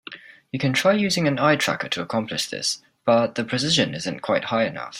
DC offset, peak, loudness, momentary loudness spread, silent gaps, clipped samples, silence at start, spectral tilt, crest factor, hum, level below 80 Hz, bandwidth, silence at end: under 0.1%; -4 dBFS; -22 LUFS; 7 LU; none; under 0.1%; 0.1 s; -4 dB/octave; 18 dB; none; -62 dBFS; 16 kHz; 0 s